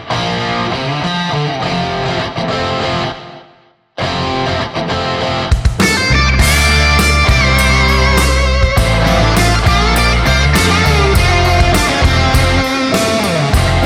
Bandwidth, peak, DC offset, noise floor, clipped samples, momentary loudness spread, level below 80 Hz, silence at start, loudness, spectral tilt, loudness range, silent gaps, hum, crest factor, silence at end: 16.5 kHz; 0 dBFS; under 0.1%; -48 dBFS; under 0.1%; 7 LU; -18 dBFS; 0 s; -12 LUFS; -4.5 dB/octave; 7 LU; none; none; 12 dB; 0 s